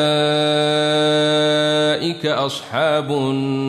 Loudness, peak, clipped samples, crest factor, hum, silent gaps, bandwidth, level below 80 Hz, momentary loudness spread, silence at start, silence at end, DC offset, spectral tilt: -17 LUFS; -6 dBFS; under 0.1%; 12 dB; none; none; 13.5 kHz; -64 dBFS; 5 LU; 0 s; 0 s; under 0.1%; -5 dB/octave